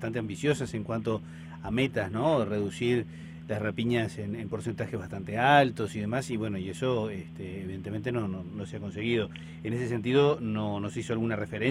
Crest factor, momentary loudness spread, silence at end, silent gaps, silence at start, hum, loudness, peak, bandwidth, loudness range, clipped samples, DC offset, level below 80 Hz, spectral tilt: 22 dB; 13 LU; 0 s; none; 0 s; none; -30 LUFS; -8 dBFS; 14 kHz; 5 LU; under 0.1%; under 0.1%; -58 dBFS; -6.5 dB/octave